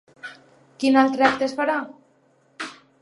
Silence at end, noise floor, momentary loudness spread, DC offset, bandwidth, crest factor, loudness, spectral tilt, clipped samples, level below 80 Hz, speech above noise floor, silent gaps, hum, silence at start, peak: 0.3 s; -61 dBFS; 22 LU; under 0.1%; 11 kHz; 22 dB; -20 LUFS; -4 dB/octave; under 0.1%; -66 dBFS; 41 dB; none; none; 0.25 s; -2 dBFS